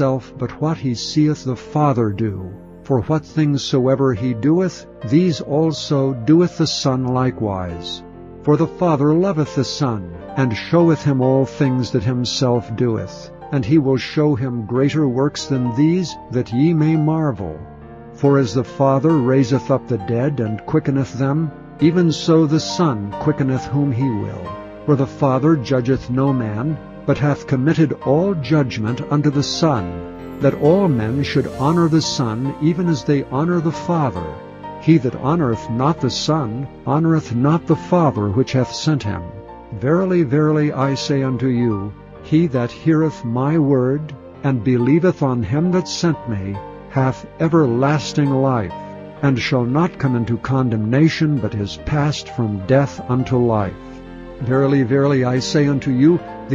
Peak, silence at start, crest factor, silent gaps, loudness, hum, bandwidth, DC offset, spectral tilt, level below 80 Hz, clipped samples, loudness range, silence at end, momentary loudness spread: -2 dBFS; 0 s; 16 dB; none; -18 LUFS; none; 7.8 kHz; under 0.1%; -7 dB/octave; -46 dBFS; under 0.1%; 2 LU; 0 s; 10 LU